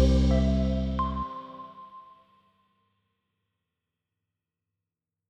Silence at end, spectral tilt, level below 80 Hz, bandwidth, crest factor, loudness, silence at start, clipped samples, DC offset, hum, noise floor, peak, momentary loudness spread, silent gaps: 3.3 s; -8 dB/octave; -34 dBFS; 8 kHz; 20 dB; -27 LUFS; 0 s; under 0.1%; under 0.1%; none; -88 dBFS; -10 dBFS; 22 LU; none